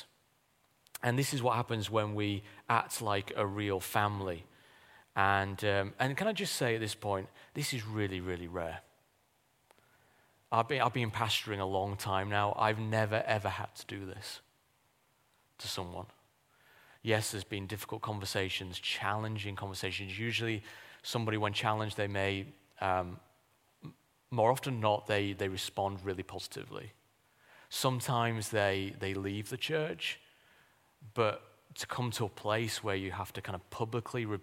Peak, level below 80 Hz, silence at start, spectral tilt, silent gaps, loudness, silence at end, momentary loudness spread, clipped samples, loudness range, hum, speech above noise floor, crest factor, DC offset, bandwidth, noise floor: -12 dBFS; -68 dBFS; 0 s; -4.5 dB/octave; none; -34 LUFS; 0 s; 12 LU; under 0.1%; 6 LU; none; 38 dB; 24 dB; under 0.1%; 16.5 kHz; -73 dBFS